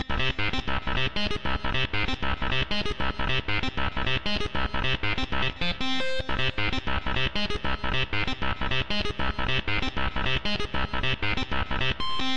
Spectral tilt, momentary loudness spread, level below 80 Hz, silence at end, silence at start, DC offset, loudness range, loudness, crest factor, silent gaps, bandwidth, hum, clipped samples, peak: -5 dB/octave; 3 LU; -36 dBFS; 0 s; 0 s; 3%; 0 LU; -28 LUFS; 10 dB; none; 8.8 kHz; none; under 0.1%; -14 dBFS